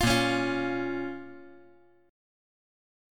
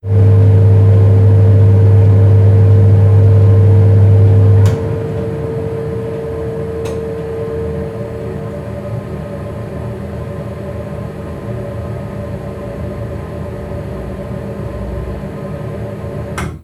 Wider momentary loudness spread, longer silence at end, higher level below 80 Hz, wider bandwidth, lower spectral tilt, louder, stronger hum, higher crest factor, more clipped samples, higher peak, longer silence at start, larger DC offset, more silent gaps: first, 22 LU vs 16 LU; first, 1 s vs 0.05 s; second, -48 dBFS vs -32 dBFS; first, 17.5 kHz vs 3.8 kHz; second, -4.5 dB/octave vs -9.5 dB/octave; second, -29 LUFS vs -13 LUFS; neither; first, 20 dB vs 12 dB; neither; second, -12 dBFS vs 0 dBFS; about the same, 0 s vs 0.05 s; neither; neither